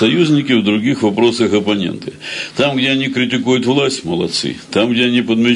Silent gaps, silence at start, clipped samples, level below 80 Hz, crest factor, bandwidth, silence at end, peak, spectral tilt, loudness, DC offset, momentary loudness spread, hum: none; 0 s; under 0.1%; -56 dBFS; 12 dB; 11 kHz; 0 s; -2 dBFS; -5 dB/octave; -15 LUFS; under 0.1%; 6 LU; none